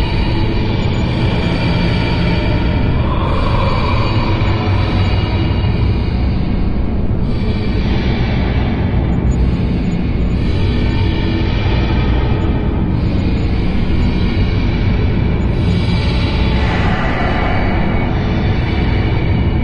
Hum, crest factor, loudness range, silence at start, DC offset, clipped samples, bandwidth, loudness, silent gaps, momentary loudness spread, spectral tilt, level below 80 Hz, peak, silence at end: none; 10 dB; 1 LU; 0 s; under 0.1%; under 0.1%; 7.4 kHz; -16 LUFS; none; 2 LU; -8 dB/octave; -18 dBFS; -4 dBFS; 0 s